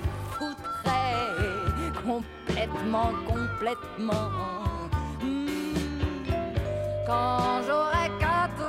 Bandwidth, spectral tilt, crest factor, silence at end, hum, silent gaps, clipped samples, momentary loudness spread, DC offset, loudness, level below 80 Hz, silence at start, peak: 16 kHz; -6 dB/octave; 16 dB; 0 s; none; none; under 0.1%; 7 LU; under 0.1%; -29 LUFS; -40 dBFS; 0 s; -12 dBFS